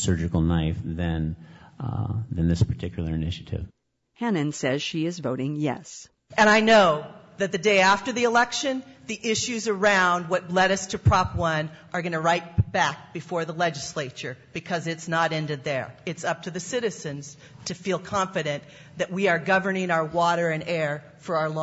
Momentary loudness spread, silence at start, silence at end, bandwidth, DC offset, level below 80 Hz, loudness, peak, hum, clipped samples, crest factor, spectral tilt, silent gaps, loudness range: 15 LU; 0 s; 0 s; 8 kHz; under 0.1%; -48 dBFS; -25 LUFS; -8 dBFS; none; under 0.1%; 16 dB; -5 dB/octave; none; 8 LU